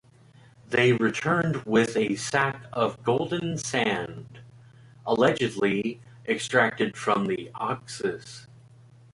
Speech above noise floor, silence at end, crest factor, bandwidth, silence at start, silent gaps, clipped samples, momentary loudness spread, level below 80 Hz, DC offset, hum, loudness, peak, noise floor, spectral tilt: 29 dB; 0.7 s; 20 dB; 11.5 kHz; 0.7 s; none; under 0.1%; 11 LU; -62 dBFS; under 0.1%; none; -26 LUFS; -8 dBFS; -54 dBFS; -5 dB/octave